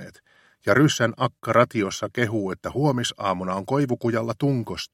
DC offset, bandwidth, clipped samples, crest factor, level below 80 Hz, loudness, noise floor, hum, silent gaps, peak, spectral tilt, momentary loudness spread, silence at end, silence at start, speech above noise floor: under 0.1%; 16 kHz; under 0.1%; 22 dB; -58 dBFS; -23 LUFS; -57 dBFS; none; none; -2 dBFS; -5.5 dB/octave; 8 LU; 0.1 s; 0 s; 34 dB